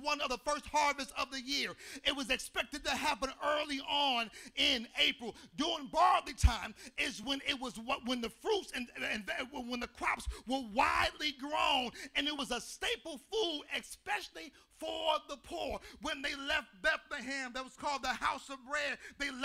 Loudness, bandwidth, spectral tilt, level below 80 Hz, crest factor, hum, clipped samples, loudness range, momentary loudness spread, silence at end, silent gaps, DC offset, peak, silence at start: -35 LUFS; 16 kHz; -3 dB/octave; -48 dBFS; 24 dB; none; under 0.1%; 5 LU; 10 LU; 0 s; none; under 0.1%; -14 dBFS; 0 s